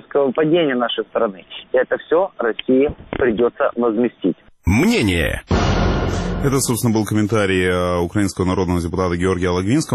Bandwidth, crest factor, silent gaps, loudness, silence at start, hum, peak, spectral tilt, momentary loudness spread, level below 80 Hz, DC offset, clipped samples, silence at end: 13.5 kHz; 14 dB; none; -18 LUFS; 0.15 s; none; -4 dBFS; -5.5 dB/octave; 5 LU; -32 dBFS; under 0.1%; under 0.1%; 0 s